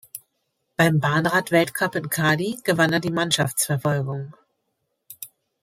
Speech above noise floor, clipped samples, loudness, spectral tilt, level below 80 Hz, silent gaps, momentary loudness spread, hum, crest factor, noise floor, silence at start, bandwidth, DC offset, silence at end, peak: 54 dB; under 0.1%; -21 LUFS; -4.5 dB/octave; -62 dBFS; none; 19 LU; none; 20 dB; -75 dBFS; 0.15 s; 16 kHz; under 0.1%; 0.35 s; -2 dBFS